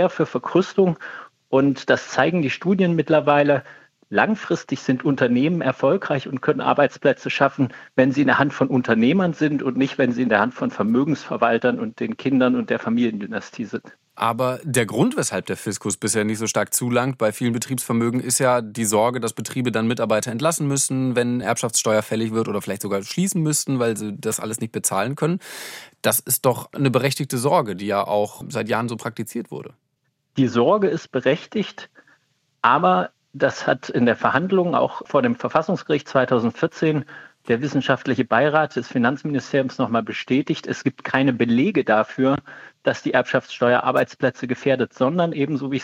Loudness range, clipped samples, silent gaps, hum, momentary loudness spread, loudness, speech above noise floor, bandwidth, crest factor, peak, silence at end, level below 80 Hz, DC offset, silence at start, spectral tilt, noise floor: 3 LU; under 0.1%; none; none; 8 LU; -21 LUFS; 51 dB; 16.5 kHz; 18 dB; -2 dBFS; 0 s; -66 dBFS; under 0.1%; 0 s; -5 dB/octave; -72 dBFS